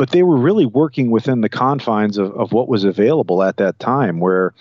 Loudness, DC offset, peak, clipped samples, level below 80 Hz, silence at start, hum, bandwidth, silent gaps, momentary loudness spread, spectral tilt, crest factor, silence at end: -16 LUFS; under 0.1%; -4 dBFS; under 0.1%; -64 dBFS; 0 s; none; 7.2 kHz; none; 5 LU; -8.5 dB/octave; 12 dB; 0.1 s